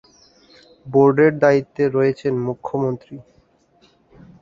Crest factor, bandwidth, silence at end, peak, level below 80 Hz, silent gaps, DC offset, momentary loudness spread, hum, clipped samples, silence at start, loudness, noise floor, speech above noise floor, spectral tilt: 18 dB; 7.4 kHz; 1.2 s; -2 dBFS; -58 dBFS; none; under 0.1%; 14 LU; none; under 0.1%; 0.85 s; -18 LUFS; -58 dBFS; 40 dB; -8.5 dB/octave